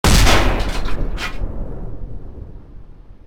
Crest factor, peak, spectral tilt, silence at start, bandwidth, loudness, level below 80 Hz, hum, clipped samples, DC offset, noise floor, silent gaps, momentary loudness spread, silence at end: 16 dB; 0 dBFS; -4 dB/octave; 0.05 s; 16 kHz; -19 LUFS; -22 dBFS; none; under 0.1%; under 0.1%; -37 dBFS; none; 23 LU; 0.1 s